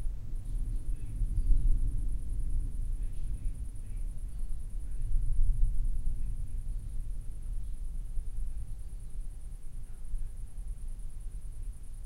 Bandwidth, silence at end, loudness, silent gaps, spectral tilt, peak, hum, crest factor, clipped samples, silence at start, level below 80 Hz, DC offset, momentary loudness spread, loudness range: 11 kHz; 0 s; -40 LUFS; none; -7 dB/octave; -12 dBFS; none; 18 dB; under 0.1%; 0 s; -32 dBFS; under 0.1%; 12 LU; 8 LU